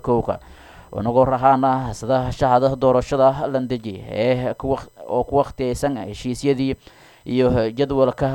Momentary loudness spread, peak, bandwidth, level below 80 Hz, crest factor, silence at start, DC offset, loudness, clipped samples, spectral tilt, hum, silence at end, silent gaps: 11 LU; -2 dBFS; 17 kHz; -40 dBFS; 18 dB; 0.05 s; under 0.1%; -20 LUFS; under 0.1%; -7 dB/octave; none; 0 s; none